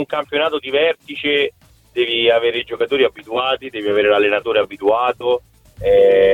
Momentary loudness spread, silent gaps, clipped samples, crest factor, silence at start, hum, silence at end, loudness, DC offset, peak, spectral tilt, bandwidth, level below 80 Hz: 8 LU; none; under 0.1%; 14 dB; 0 s; none; 0 s; -17 LUFS; under 0.1%; -2 dBFS; -5 dB/octave; 4.3 kHz; -48 dBFS